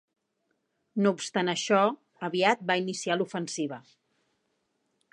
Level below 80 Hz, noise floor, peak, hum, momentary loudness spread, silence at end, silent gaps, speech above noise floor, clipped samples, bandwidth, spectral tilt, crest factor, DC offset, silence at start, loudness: -82 dBFS; -77 dBFS; -8 dBFS; none; 11 LU; 1.3 s; none; 50 dB; under 0.1%; 11 kHz; -4 dB/octave; 22 dB; under 0.1%; 0.95 s; -28 LUFS